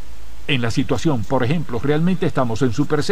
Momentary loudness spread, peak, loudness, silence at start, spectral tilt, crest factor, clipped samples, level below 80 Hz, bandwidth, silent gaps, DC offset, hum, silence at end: 3 LU; -4 dBFS; -20 LUFS; 0.05 s; -6.5 dB/octave; 14 dB; under 0.1%; -42 dBFS; 15.5 kHz; none; 9%; none; 0 s